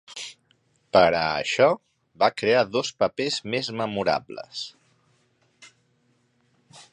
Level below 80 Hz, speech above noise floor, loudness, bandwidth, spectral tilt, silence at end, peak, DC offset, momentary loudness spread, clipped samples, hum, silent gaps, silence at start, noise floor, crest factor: -60 dBFS; 44 dB; -23 LUFS; 11 kHz; -4 dB/octave; 0.1 s; -4 dBFS; under 0.1%; 16 LU; under 0.1%; none; none; 0.1 s; -67 dBFS; 22 dB